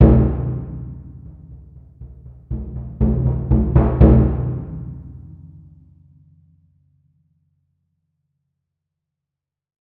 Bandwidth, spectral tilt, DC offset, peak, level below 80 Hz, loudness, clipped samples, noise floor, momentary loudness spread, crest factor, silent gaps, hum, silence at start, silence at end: 3.1 kHz; -13.5 dB/octave; under 0.1%; -2 dBFS; -24 dBFS; -18 LUFS; under 0.1%; -86 dBFS; 28 LU; 18 dB; none; none; 0 s; 4.55 s